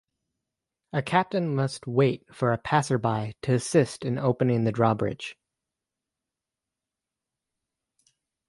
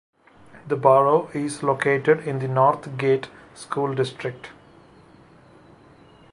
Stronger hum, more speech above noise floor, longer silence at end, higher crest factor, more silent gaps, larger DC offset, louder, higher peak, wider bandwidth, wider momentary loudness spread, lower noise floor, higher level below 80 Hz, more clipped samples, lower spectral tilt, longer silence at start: neither; first, 63 dB vs 29 dB; first, 3.15 s vs 1.8 s; about the same, 20 dB vs 22 dB; neither; neither; second, -26 LUFS vs -22 LUFS; second, -6 dBFS vs -2 dBFS; about the same, 11.5 kHz vs 11.5 kHz; second, 7 LU vs 15 LU; first, -88 dBFS vs -51 dBFS; about the same, -62 dBFS vs -64 dBFS; neither; about the same, -6.5 dB/octave vs -6.5 dB/octave; first, 0.95 s vs 0.55 s